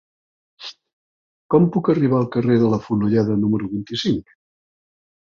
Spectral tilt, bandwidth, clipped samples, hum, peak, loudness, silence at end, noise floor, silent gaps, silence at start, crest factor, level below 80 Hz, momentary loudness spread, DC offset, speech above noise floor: -8 dB/octave; 7.4 kHz; under 0.1%; none; -2 dBFS; -19 LUFS; 1.2 s; under -90 dBFS; 0.93-1.50 s; 0.6 s; 18 dB; -54 dBFS; 16 LU; under 0.1%; over 72 dB